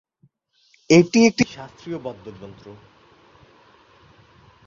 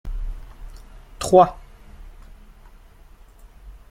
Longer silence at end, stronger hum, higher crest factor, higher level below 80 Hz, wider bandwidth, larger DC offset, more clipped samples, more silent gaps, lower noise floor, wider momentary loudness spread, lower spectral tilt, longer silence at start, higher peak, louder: first, 1.95 s vs 0.2 s; neither; about the same, 22 dB vs 22 dB; second, -60 dBFS vs -36 dBFS; second, 7.6 kHz vs 15.5 kHz; neither; neither; neither; first, -62 dBFS vs -47 dBFS; about the same, 25 LU vs 26 LU; about the same, -5.5 dB/octave vs -6 dB/octave; first, 0.9 s vs 0.05 s; about the same, -2 dBFS vs -2 dBFS; about the same, -18 LUFS vs -17 LUFS